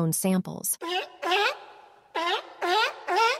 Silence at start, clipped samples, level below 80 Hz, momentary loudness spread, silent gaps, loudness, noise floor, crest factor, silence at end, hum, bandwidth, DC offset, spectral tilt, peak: 0 s; under 0.1%; -74 dBFS; 6 LU; none; -27 LUFS; -51 dBFS; 16 dB; 0 s; none; 16 kHz; under 0.1%; -3.5 dB/octave; -12 dBFS